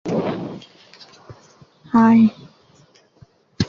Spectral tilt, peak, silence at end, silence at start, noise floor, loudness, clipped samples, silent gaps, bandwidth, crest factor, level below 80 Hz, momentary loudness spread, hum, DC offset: -7 dB/octave; -2 dBFS; 0 s; 0.05 s; -54 dBFS; -17 LUFS; under 0.1%; none; 7 kHz; 18 dB; -52 dBFS; 20 LU; none; under 0.1%